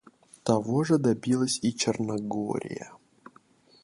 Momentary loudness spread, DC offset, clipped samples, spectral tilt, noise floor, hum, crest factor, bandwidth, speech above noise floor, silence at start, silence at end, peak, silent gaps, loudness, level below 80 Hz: 12 LU; under 0.1%; under 0.1%; -5 dB/octave; -59 dBFS; none; 18 dB; 11.5 kHz; 33 dB; 0.45 s; 0.9 s; -10 dBFS; none; -27 LUFS; -66 dBFS